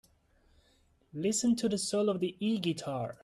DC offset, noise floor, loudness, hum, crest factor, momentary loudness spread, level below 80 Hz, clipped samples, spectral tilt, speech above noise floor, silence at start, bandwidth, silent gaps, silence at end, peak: under 0.1%; -68 dBFS; -32 LUFS; none; 14 dB; 7 LU; -68 dBFS; under 0.1%; -4.5 dB/octave; 37 dB; 1.15 s; 13.5 kHz; none; 0.1 s; -18 dBFS